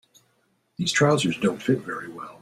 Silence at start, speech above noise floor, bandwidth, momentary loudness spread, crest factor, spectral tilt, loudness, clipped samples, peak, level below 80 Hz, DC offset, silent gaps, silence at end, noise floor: 0.8 s; 45 dB; 14 kHz; 16 LU; 20 dB; -4.5 dB/octave; -24 LUFS; under 0.1%; -6 dBFS; -62 dBFS; under 0.1%; none; 0.05 s; -68 dBFS